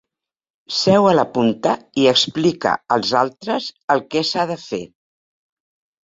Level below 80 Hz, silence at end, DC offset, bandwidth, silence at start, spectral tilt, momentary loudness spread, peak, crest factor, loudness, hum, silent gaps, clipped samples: -60 dBFS; 1.2 s; under 0.1%; 8 kHz; 0.7 s; -4.5 dB/octave; 10 LU; -2 dBFS; 18 dB; -18 LUFS; none; 3.84-3.88 s; under 0.1%